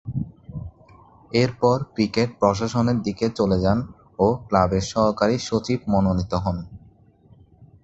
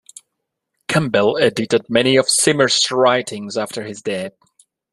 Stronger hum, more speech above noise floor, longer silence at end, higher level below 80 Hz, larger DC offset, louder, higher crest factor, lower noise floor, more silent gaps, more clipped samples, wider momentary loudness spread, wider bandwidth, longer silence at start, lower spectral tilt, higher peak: neither; second, 32 dB vs 60 dB; second, 0.2 s vs 0.65 s; first, -42 dBFS vs -58 dBFS; neither; second, -22 LUFS vs -17 LUFS; about the same, 20 dB vs 16 dB; second, -53 dBFS vs -77 dBFS; neither; neither; about the same, 14 LU vs 12 LU; second, 8.2 kHz vs 13.5 kHz; second, 0.05 s vs 0.9 s; first, -6.5 dB/octave vs -3 dB/octave; about the same, -2 dBFS vs -2 dBFS